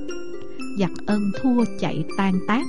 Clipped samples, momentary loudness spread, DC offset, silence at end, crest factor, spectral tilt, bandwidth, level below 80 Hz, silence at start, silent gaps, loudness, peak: under 0.1%; 13 LU; 4%; 0 s; 14 dB; -7 dB/octave; 11.5 kHz; -52 dBFS; 0 s; none; -24 LUFS; -10 dBFS